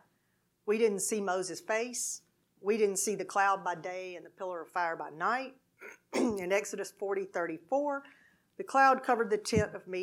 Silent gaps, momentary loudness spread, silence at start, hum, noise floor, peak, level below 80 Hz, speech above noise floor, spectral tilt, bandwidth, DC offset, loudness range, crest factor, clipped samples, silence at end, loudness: none; 13 LU; 0.65 s; none; -76 dBFS; -12 dBFS; -68 dBFS; 44 dB; -3.5 dB/octave; 16 kHz; under 0.1%; 4 LU; 22 dB; under 0.1%; 0 s; -32 LUFS